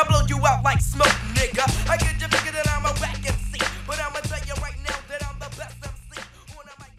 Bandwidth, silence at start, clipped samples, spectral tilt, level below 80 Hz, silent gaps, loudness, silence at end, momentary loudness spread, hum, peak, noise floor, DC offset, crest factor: 15.5 kHz; 0 s; under 0.1%; -4 dB/octave; -30 dBFS; none; -23 LUFS; 0.1 s; 18 LU; none; -4 dBFS; -44 dBFS; under 0.1%; 20 dB